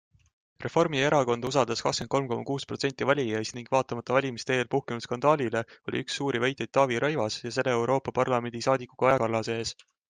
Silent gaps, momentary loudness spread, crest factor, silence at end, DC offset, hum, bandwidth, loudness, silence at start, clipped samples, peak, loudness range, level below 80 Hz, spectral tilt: none; 7 LU; 20 dB; 0.35 s; under 0.1%; none; 9.8 kHz; -28 LUFS; 0.6 s; under 0.1%; -8 dBFS; 2 LU; -64 dBFS; -5 dB/octave